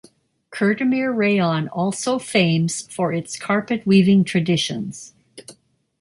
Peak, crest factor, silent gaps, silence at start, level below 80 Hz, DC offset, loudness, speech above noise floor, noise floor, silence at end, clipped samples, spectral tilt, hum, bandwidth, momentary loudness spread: -4 dBFS; 16 dB; none; 0.5 s; -60 dBFS; under 0.1%; -20 LUFS; 34 dB; -53 dBFS; 0.5 s; under 0.1%; -5.5 dB/octave; none; 11.5 kHz; 11 LU